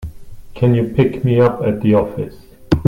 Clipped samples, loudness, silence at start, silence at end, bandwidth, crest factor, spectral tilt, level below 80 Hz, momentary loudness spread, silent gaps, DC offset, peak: under 0.1%; -16 LUFS; 0 s; 0 s; 10 kHz; 16 dB; -9.5 dB/octave; -36 dBFS; 13 LU; none; under 0.1%; 0 dBFS